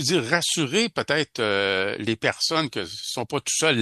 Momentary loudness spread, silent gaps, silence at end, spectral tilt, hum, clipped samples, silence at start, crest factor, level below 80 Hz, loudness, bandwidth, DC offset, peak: 7 LU; none; 0 s; -3 dB/octave; none; under 0.1%; 0 s; 20 dB; -64 dBFS; -23 LUFS; 12.5 kHz; under 0.1%; -4 dBFS